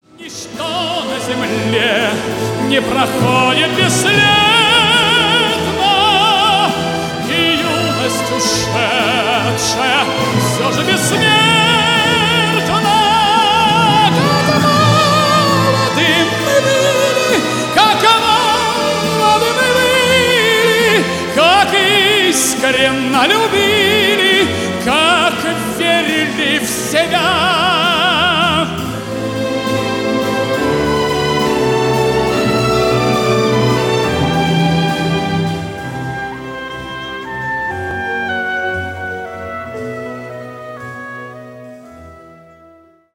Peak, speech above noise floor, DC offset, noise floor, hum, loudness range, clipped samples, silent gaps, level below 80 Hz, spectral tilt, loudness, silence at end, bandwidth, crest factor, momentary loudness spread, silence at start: 0 dBFS; 33 dB; under 0.1%; -46 dBFS; none; 10 LU; under 0.1%; none; -42 dBFS; -3.5 dB/octave; -12 LUFS; 0.9 s; 19.5 kHz; 14 dB; 13 LU; 0.2 s